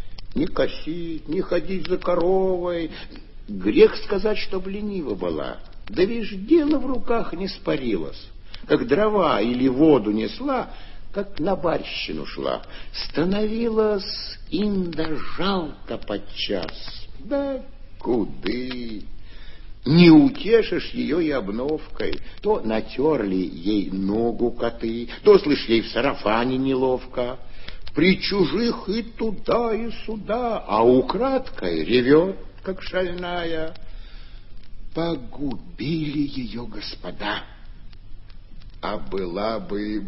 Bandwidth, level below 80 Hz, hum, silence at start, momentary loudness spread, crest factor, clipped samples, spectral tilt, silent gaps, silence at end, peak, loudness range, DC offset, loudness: 5.8 kHz; -38 dBFS; none; 0 s; 15 LU; 20 dB; under 0.1%; -5 dB/octave; none; 0 s; -2 dBFS; 10 LU; under 0.1%; -23 LUFS